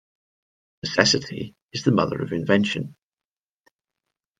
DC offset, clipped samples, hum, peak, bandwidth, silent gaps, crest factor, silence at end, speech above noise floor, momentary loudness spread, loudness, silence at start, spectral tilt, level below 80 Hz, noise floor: under 0.1%; under 0.1%; none; 0 dBFS; 9.4 kHz; 1.62-1.69 s; 26 dB; 1.5 s; over 67 dB; 15 LU; -22 LUFS; 0.85 s; -4.5 dB/octave; -60 dBFS; under -90 dBFS